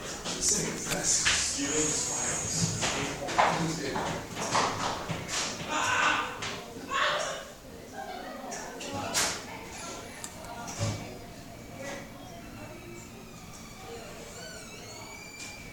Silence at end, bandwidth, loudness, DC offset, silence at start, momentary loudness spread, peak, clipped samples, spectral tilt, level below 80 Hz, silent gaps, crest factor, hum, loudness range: 0 s; 19 kHz; -30 LUFS; under 0.1%; 0 s; 18 LU; -10 dBFS; under 0.1%; -2 dB/octave; -54 dBFS; none; 22 dB; none; 16 LU